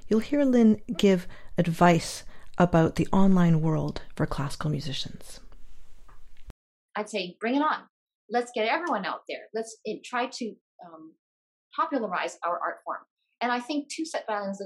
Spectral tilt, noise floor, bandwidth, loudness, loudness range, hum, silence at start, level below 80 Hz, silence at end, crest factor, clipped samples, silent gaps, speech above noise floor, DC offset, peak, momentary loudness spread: -6 dB/octave; under -90 dBFS; 14 kHz; -27 LUFS; 10 LU; none; 0.05 s; -48 dBFS; 0 s; 22 dB; under 0.1%; 6.50-6.89 s, 7.90-8.06 s, 8.15-8.28 s, 10.61-10.79 s, 11.19-11.71 s, 13.10-13.17 s; over 64 dB; under 0.1%; -6 dBFS; 15 LU